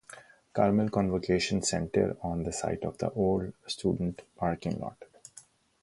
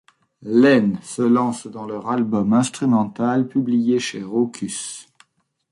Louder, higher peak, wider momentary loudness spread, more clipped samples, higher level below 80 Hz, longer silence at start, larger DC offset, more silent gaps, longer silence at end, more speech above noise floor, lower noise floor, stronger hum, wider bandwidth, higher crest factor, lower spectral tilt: second, -30 LUFS vs -20 LUFS; second, -10 dBFS vs -4 dBFS; first, 21 LU vs 14 LU; neither; first, -52 dBFS vs -62 dBFS; second, 0.1 s vs 0.4 s; neither; neither; second, 0.4 s vs 0.7 s; second, 27 dB vs 46 dB; second, -57 dBFS vs -65 dBFS; neither; about the same, 11.5 kHz vs 11.5 kHz; about the same, 20 dB vs 16 dB; about the same, -5.5 dB/octave vs -5.5 dB/octave